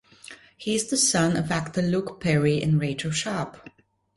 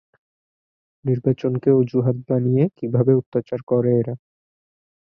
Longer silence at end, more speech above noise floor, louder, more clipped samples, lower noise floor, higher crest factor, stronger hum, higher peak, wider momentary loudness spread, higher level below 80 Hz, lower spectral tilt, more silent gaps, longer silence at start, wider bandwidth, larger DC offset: second, 0.45 s vs 0.95 s; second, 23 dB vs over 71 dB; second, -24 LUFS vs -20 LUFS; neither; second, -48 dBFS vs under -90 dBFS; about the same, 16 dB vs 18 dB; neither; second, -8 dBFS vs -4 dBFS; first, 15 LU vs 8 LU; first, -54 dBFS vs -60 dBFS; second, -4.5 dB/octave vs -12 dB/octave; second, none vs 3.26-3.32 s, 3.63-3.67 s; second, 0.25 s vs 1.05 s; first, 11.5 kHz vs 5.6 kHz; neither